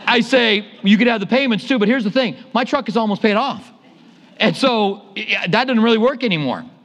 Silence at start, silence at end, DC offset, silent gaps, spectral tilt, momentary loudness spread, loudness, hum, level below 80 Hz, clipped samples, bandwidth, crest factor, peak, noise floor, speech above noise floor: 0 s; 0.15 s; under 0.1%; none; -5.5 dB/octave; 6 LU; -17 LUFS; none; -66 dBFS; under 0.1%; 11 kHz; 16 dB; 0 dBFS; -46 dBFS; 30 dB